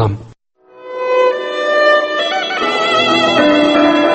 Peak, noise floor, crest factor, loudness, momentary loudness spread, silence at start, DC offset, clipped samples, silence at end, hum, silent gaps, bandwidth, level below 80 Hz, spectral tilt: 0 dBFS; -44 dBFS; 14 dB; -13 LUFS; 8 LU; 0 s; under 0.1%; under 0.1%; 0 s; none; none; 8.6 kHz; -48 dBFS; -5 dB/octave